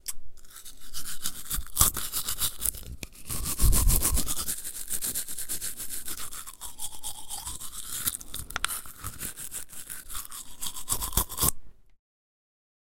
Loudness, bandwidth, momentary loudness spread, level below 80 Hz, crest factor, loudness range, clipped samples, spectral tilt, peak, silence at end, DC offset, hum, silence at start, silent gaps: -30 LUFS; 17 kHz; 16 LU; -36 dBFS; 28 dB; 7 LU; under 0.1%; -2 dB/octave; -2 dBFS; 1 s; under 0.1%; none; 0.05 s; none